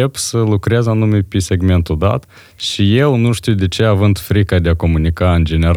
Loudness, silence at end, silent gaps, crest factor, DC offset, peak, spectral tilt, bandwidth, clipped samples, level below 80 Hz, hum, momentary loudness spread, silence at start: -14 LUFS; 0 s; none; 12 dB; under 0.1%; 0 dBFS; -6 dB/octave; 16 kHz; under 0.1%; -30 dBFS; none; 4 LU; 0 s